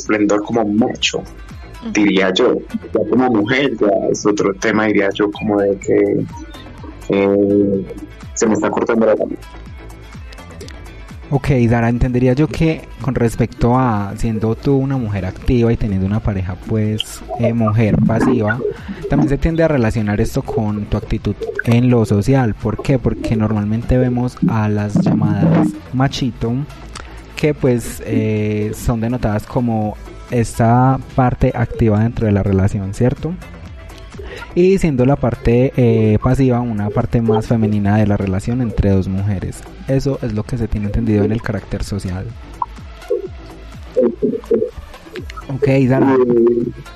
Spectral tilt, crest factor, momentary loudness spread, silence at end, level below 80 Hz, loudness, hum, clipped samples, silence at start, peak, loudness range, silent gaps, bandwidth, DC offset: -7 dB/octave; 14 dB; 17 LU; 0 s; -32 dBFS; -16 LUFS; none; under 0.1%; 0 s; -2 dBFS; 5 LU; none; 13 kHz; under 0.1%